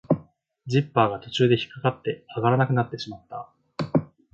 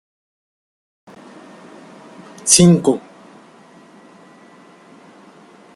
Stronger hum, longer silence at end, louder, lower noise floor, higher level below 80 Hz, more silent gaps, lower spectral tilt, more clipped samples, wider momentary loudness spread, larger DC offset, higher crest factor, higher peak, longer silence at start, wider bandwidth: neither; second, 0.3 s vs 2.75 s; second, -25 LUFS vs -13 LUFS; first, -51 dBFS vs -45 dBFS; second, -60 dBFS vs -54 dBFS; neither; first, -7 dB/octave vs -4.5 dB/octave; neither; about the same, 17 LU vs 17 LU; neither; about the same, 20 dB vs 22 dB; second, -4 dBFS vs 0 dBFS; second, 0.1 s vs 2.45 s; second, 7.6 kHz vs 13 kHz